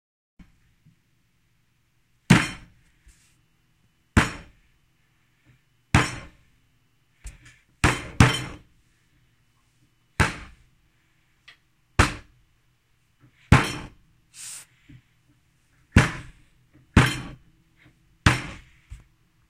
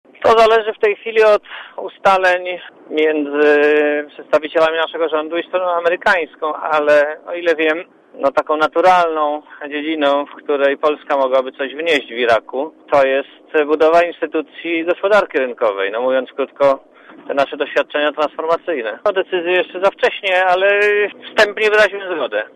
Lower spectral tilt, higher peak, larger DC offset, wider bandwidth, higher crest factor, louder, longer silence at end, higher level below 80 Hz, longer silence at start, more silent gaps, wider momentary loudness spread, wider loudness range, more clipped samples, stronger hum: about the same, -5 dB/octave vs -4 dB/octave; about the same, 0 dBFS vs -2 dBFS; neither; first, 15.5 kHz vs 11.5 kHz; first, 28 dB vs 14 dB; second, -23 LUFS vs -16 LUFS; first, 0.55 s vs 0.05 s; first, -38 dBFS vs -58 dBFS; first, 2.3 s vs 0.2 s; neither; first, 23 LU vs 9 LU; first, 6 LU vs 3 LU; neither; neither